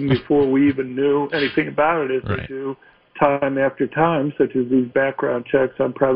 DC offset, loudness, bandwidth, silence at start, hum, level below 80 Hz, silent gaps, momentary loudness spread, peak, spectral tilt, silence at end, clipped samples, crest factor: under 0.1%; -20 LUFS; 5.4 kHz; 0 s; none; -50 dBFS; none; 7 LU; -2 dBFS; -10 dB/octave; 0 s; under 0.1%; 18 dB